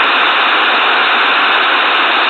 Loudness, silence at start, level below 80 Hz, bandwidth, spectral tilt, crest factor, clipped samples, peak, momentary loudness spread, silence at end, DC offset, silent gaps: -9 LUFS; 0 s; -66 dBFS; 8.8 kHz; -2 dB/octave; 10 dB; under 0.1%; 0 dBFS; 0 LU; 0 s; under 0.1%; none